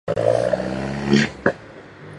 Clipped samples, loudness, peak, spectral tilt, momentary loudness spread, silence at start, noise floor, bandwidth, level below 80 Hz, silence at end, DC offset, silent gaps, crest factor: under 0.1%; -21 LUFS; 0 dBFS; -6 dB/octave; 19 LU; 0.05 s; -40 dBFS; 11 kHz; -46 dBFS; 0 s; under 0.1%; none; 20 dB